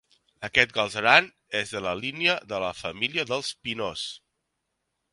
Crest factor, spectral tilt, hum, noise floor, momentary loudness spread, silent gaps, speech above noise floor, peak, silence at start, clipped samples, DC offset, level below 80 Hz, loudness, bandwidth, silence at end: 26 dB; -3 dB/octave; none; -80 dBFS; 13 LU; none; 53 dB; 0 dBFS; 0.4 s; under 0.1%; under 0.1%; -60 dBFS; -25 LUFS; 11.5 kHz; 0.95 s